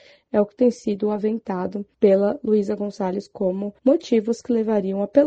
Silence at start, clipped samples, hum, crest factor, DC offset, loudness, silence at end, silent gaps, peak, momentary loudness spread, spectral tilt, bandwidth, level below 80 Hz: 0.35 s; under 0.1%; none; 18 dB; under 0.1%; -22 LUFS; 0 s; none; -2 dBFS; 8 LU; -7.5 dB/octave; 8.4 kHz; -62 dBFS